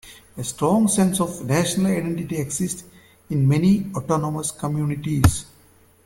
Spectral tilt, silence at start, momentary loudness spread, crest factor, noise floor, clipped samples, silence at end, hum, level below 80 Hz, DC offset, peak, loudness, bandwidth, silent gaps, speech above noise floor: -5.5 dB/octave; 0.05 s; 10 LU; 22 dB; -54 dBFS; under 0.1%; 0.6 s; none; -40 dBFS; under 0.1%; 0 dBFS; -22 LUFS; 17 kHz; none; 33 dB